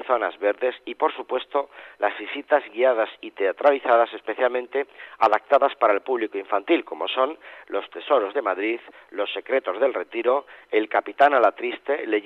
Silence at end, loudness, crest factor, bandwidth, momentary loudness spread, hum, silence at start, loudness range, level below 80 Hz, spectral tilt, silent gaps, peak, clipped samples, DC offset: 0.05 s; -23 LUFS; 18 dB; 6 kHz; 10 LU; none; 0 s; 3 LU; -76 dBFS; -4.5 dB/octave; none; -6 dBFS; under 0.1%; under 0.1%